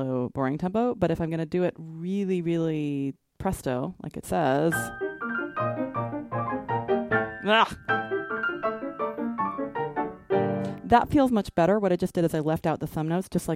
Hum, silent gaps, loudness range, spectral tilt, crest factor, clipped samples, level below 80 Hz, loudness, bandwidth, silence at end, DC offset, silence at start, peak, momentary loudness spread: none; none; 4 LU; -6.5 dB/octave; 20 dB; under 0.1%; -52 dBFS; -27 LUFS; 16 kHz; 0 s; under 0.1%; 0 s; -6 dBFS; 9 LU